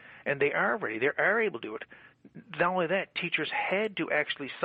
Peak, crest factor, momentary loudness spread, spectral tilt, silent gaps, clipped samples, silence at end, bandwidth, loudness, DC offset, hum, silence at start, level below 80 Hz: -14 dBFS; 18 dB; 13 LU; -7.5 dB/octave; none; under 0.1%; 0 s; 5 kHz; -29 LUFS; under 0.1%; none; 0 s; -74 dBFS